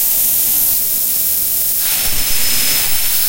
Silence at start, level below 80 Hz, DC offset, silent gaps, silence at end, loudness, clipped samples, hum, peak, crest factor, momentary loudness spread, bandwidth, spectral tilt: 0 s; -34 dBFS; under 0.1%; none; 0 s; -12 LUFS; under 0.1%; none; 0 dBFS; 14 dB; 3 LU; 16.5 kHz; 0.5 dB/octave